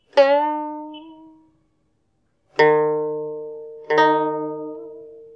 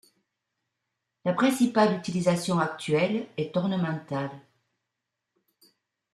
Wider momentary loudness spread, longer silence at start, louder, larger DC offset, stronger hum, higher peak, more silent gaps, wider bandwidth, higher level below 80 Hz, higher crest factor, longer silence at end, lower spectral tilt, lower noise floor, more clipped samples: first, 21 LU vs 10 LU; second, 0.15 s vs 1.25 s; first, -20 LUFS vs -26 LUFS; neither; neither; first, -4 dBFS vs -10 dBFS; neither; second, 7.4 kHz vs 14 kHz; about the same, -74 dBFS vs -70 dBFS; about the same, 18 dB vs 18 dB; second, 0.1 s vs 1.75 s; about the same, -5.5 dB/octave vs -6 dB/octave; second, -69 dBFS vs -84 dBFS; neither